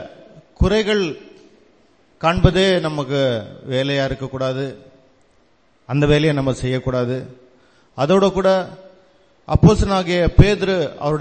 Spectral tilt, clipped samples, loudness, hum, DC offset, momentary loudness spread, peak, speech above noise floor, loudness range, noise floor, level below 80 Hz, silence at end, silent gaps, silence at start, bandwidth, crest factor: -6.5 dB/octave; under 0.1%; -18 LUFS; none; under 0.1%; 12 LU; 0 dBFS; 41 dB; 5 LU; -58 dBFS; -30 dBFS; 0 s; none; 0 s; 8.8 kHz; 18 dB